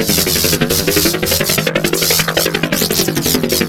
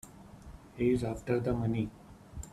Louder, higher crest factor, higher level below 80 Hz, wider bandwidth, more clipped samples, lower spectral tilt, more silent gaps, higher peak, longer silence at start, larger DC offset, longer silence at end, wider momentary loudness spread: first, -13 LUFS vs -33 LUFS; about the same, 14 dB vs 18 dB; first, -36 dBFS vs -52 dBFS; first, over 20 kHz vs 14 kHz; neither; second, -3 dB/octave vs -7.5 dB/octave; neither; first, 0 dBFS vs -16 dBFS; about the same, 0 s vs 0.05 s; first, 0.7% vs under 0.1%; about the same, 0 s vs 0.05 s; second, 3 LU vs 22 LU